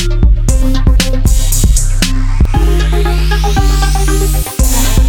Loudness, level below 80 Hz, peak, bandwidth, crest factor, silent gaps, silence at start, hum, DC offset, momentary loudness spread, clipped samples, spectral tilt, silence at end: -12 LUFS; -10 dBFS; 0 dBFS; 18 kHz; 8 dB; none; 0 s; none; under 0.1%; 2 LU; under 0.1%; -4.5 dB/octave; 0 s